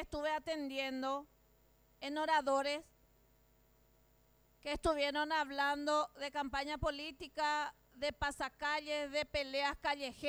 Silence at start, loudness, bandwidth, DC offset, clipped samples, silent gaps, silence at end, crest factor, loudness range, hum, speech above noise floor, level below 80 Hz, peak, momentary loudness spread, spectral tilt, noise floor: 0 s; -38 LUFS; over 20 kHz; under 0.1%; under 0.1%; none; 0 s; 16 dB; 3 LU; 60 Hz at -75 dBFS; 32 dB; -58 dBFS; -22 dBFS; 9 LU; -3.5 dB/octave; -70 dBFS